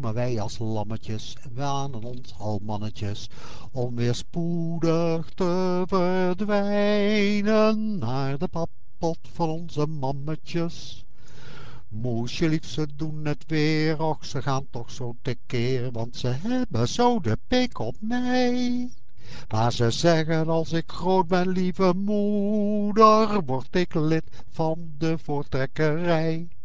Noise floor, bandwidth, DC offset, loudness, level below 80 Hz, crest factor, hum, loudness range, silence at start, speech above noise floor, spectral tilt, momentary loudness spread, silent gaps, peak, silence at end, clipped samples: -44 dBFS; 8 kHz; 5%; -25 LUFS; -48 dBFS; 22 dB; none; 9 LU; 0 s; 19 dB; -6.5 dB/octave; 12 LU; none; -4 dBFS; 0 s; under 0.1%